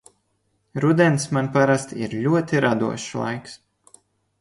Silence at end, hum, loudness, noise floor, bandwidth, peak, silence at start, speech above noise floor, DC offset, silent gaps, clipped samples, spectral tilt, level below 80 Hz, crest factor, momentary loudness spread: 0.85 s; none; -21 LUFS; -69 dBFS; 11.5 kHz; -2 dBFS; 0.75 s; 49 dB; under 0.1%; none; under 0.1%; -6 dB/octave; -60 dBFS; 20 dB; 11 LU